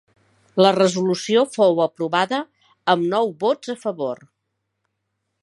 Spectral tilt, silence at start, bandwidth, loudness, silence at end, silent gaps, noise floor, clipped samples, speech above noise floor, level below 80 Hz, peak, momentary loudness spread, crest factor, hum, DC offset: -5 dB/octave; 0.55 s; 11.5 kHz; -20 LUFS; 1.25 s; none; -76 dBFS; under 0.1%; 57 dB; -74 dBFS; 0 dBFS; 11 LU; 20 dB; none; under 0.1%